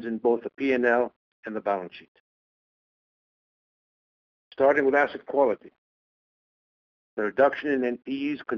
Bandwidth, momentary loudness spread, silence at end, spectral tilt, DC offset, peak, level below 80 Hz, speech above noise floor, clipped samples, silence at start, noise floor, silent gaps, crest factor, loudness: 6.6 kHz; 12 LU; 0 s; -7 dB/octave; under 0.1%; -8 dBFS; -70 dBFS; over 65 dB; under 0.1%; 0 s; under -90 dBFS; 1.16-1.43 s, 2.08-4.51 s, 5.78-7.17 s; 20 dB; -25 LUFS